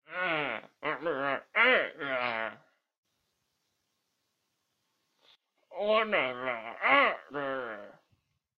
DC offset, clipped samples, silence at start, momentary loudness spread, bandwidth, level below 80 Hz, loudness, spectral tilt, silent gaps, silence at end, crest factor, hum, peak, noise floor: under 0.1%; under 0.1%; 0.1 s; 13 LU; 6.6 kHz; -74 dBFS; -29 LUFS; -5.5 dB/octave; 2.98-3.03 s; 0.65 s; 24 dB; none; -8 dBFS; -80 dBFS